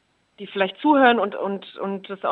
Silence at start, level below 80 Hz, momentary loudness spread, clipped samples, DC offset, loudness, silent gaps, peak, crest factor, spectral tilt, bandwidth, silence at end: 0.4 s; -76 dBFS; 15 LU; under 0.1%; under 0.1%; -21 LUFS; none; -4 dBFS; 18 dB; -7.5 dB/octave; 4.6 kHz; 0 s